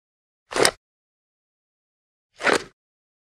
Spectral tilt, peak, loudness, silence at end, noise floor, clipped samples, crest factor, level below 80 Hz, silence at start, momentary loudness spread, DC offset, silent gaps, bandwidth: -1.5 dB/octave; 0 dBFS; -22 LUFS; 0.6 s; under -90 dBFS; under 0.1%; 28 dB; -60 dBFS; 0.5 s; 5 LU; under 0.1%; 0.77-2.30 s; 14.5 kHz